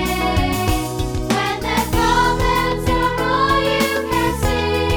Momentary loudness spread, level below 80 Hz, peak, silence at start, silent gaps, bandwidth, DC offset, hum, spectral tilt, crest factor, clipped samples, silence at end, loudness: 4 LU; -28 dBFS; -4 dBFS; 0 s; none; over 20 kHz; under 0.1%; none; -4.5 dB/octave; 14 dB; under 0.1%; 0 s; -18 LUFS